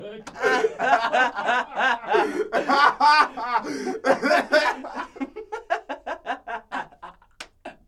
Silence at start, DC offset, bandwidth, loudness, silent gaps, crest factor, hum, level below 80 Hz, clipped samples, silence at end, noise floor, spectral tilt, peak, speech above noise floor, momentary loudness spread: 0 s; under 0.1%; 14 kHz; -22 LUFS; none; 20 dB; none; -60 dBFS; under 0.1%; 0.15 s; -46 dBFS; -3 dB/octave; -2 dBFS; 25 dB; 17 LU